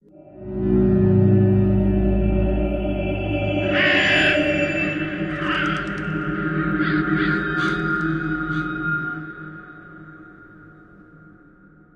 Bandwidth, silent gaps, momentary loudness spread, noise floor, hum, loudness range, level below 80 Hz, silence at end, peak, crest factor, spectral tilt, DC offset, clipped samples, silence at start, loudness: 9.6 kHz; none; 16 LU; -50 dBFS; none; 9 LU; -32 dBFS; 1.25 s; -6 dBFS; 16 dB; -7 dB/octave; under 0.1%; under 0.1%; 0.15 s; -20 LUFS